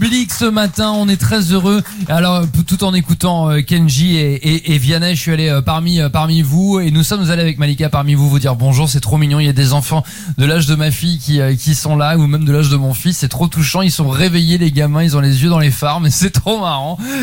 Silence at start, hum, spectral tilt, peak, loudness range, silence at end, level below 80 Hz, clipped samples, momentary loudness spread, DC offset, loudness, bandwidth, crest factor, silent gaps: 0 s; none; -5.5 dB/octave; -2 dBFS; 1 LU; 0 s; -34 dBFS; under 0.1%; 3 LU; under 0.1%; -13 LUFS; 17 kHz; 12 dB; none